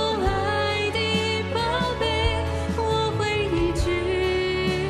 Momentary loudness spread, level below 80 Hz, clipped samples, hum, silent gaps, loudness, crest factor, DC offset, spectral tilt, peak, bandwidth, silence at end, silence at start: 2 LU; -36 dBFS; under 0.1%; none; none; -24 LUFS; 14 dB; under 0.1%; -5.5 dB/octave; -8 dBFS; 13.5 kHz; 0 s; 0 s